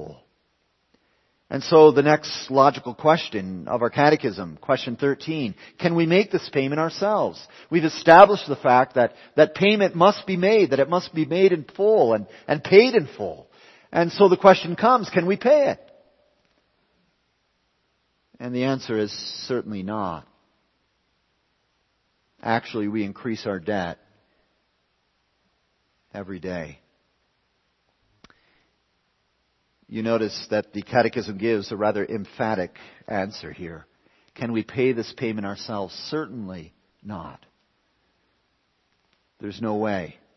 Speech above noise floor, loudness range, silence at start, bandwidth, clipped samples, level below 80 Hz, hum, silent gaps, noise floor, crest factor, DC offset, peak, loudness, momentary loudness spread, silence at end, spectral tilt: 49 dB; 19 LU; 0 s; 6.2 kHz; under 0.1%; -64 dBFS; none; none; -70 dBFS; 22 dB; under 0.1%; 0 dBFS; -21 LUFS; 19 LU; 0.25 s; -6 dB/octave